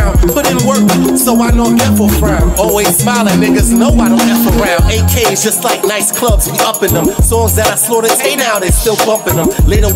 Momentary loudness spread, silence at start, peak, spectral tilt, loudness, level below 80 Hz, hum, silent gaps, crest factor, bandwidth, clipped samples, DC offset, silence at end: 2 LU; 0 s; 0 dBFS; -4.5 dB/octave; -10 LUFS; -16 dBFS; none; none; 10 dB; 16.5 kHz; under 0.1%; under 0.1%; 0 s